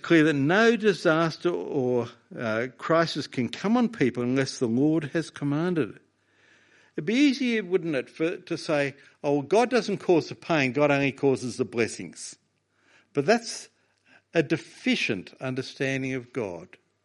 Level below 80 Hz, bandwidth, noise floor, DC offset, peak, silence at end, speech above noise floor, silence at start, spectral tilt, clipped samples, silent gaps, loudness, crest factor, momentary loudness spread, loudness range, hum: -70 dBFS; 11.5 kHz; -68 dBFS; under 0.1%; -6 dBFS; 0.4 s; 43 dB; 0.05 s; -5.5 dB/octave; under 0.1%; none; -26 LUFS; 20 dB; 11 LU; 5 LU; none